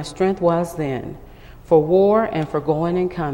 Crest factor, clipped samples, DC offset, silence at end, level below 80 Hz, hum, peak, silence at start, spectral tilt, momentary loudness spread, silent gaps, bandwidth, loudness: 16 dB; under 0.1%; under 0.1%; 0 s; -44 dBFS; none; -2 dBFS; 0 s; -7.5 dB/octave; 10 LU; none; 16.5 kHz; -19 LUFS